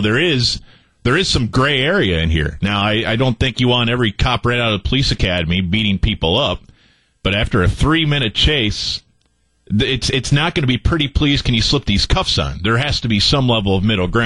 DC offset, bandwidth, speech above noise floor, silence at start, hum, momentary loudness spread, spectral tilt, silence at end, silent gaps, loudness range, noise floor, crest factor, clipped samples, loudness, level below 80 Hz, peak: 0.5%; 11.5 kHz; 45 dB; 0 s; none; 4 LU; -5 dB/octave; 0 s; none; 2 LU; -61 dBFS; 14 dB; under 0.1%; -16 LUFS; -28 dBFS; -2 dBFS